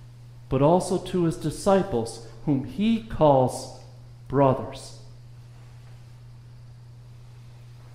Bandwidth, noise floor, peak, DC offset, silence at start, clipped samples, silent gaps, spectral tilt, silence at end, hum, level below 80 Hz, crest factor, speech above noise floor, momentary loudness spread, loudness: 15.5 kHz; -45 dBFS; -6 dBFS; under 0.1%; 0 s; under 0.1%; none; -7 dB/octave; 0 s; none; -48 dBFS; 20 dB; 22 dB; 25 LU; -24 LUFS